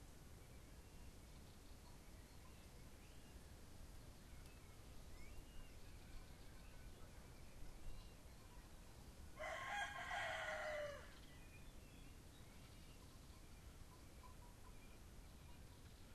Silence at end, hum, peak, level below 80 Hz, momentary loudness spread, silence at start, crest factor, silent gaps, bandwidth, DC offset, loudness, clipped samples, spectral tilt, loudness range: 0 s; none; -36 dBFS; -62 dBFS; 16 LU; 0 s; 20 dB; none; 13 kHz; under 0.1%; -56 LUFS; under 0.1%; -3.5 dB/octave; 13 LU